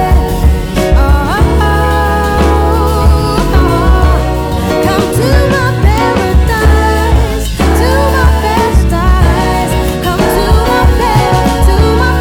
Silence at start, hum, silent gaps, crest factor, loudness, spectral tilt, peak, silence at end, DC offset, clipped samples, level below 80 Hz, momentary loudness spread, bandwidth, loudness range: 0 s; none; none; 8 dB; -10 LUFS; -6 dB/octave; 0 dBFS; 0 s; under 0.1%; 0.2%; -12 dBFS; 3 LU; 17.5 kHz; 0 LU